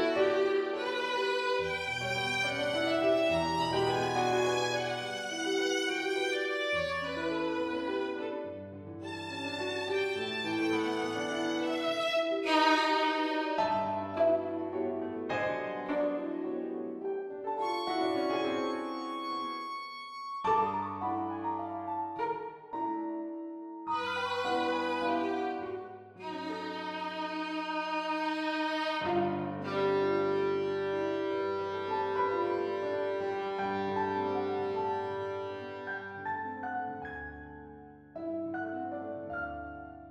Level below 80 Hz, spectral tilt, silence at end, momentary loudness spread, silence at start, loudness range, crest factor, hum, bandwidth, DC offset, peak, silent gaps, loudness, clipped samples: -66 dBFS; -4.5 dB/octave; 0 s; 11 LU; 0 s; 6 LU; 18 dB; none; 13.5 kHz; under 0.1%; -14 dBFS; none; -33 LUFS; under 0.1%